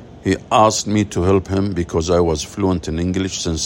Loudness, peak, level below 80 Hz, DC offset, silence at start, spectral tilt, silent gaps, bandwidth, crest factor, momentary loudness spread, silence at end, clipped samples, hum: -18 LUFS; 0 dBFS; -40 dBFS; under 0.1%; 0 s; -5 dB/octave; none; 16.5 kHz; 16 dB; 7 LU; 0 s; under 0.1%; none